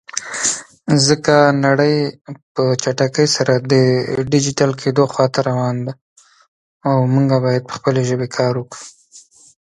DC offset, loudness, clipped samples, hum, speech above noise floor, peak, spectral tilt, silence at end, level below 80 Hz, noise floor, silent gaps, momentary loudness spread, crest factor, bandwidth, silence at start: under 0.1%; -16 LUFS; under 0.1%; none; 30 dB; 0 dBFS; -5 dB/octave; 0.45 s; -56 dBFS; -46 dBFS; 2.42-2.55 s, 6.01-6.16 s, 6.48-6.80 s; 12 LU; 16 dB; 11.5 kHz; 0.15 s